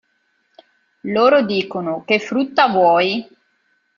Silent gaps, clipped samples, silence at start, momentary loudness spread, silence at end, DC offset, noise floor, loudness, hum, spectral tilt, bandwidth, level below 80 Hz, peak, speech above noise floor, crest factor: none; under 0.1%; 1.05 s; 10 LU; 0.75 s; under 0.1%; -65 dBFS; -17 LUFS; none; -6 dB/octave; 7.4 kHz; -64 dBFS; -2 dBFS; 49 dB; 18 dB